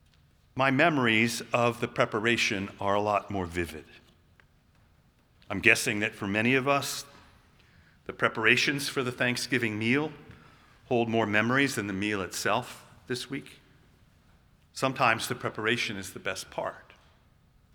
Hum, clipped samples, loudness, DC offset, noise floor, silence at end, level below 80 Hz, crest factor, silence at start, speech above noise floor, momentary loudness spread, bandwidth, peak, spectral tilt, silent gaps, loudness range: none; under 0.1%; -27 LUFS; under 0.1%; -63 dBFS; 0.95 s; -62 dBFS; 28 dB; 0.55 s; 35 dB; 15 LU; over 20 kHz; -2 dBFS; -4 dB/octave; none; 5 LU